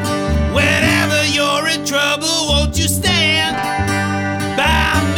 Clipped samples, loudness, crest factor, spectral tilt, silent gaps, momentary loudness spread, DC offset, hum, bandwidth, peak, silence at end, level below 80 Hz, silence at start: under 0.1%; -15 LUFS; 14 dB; -3.5 dB/octave; none; 5 LU; under 0.1%; none; over 20 kHz; 0 dBFS; 0 s; -26 dBFS; 0 s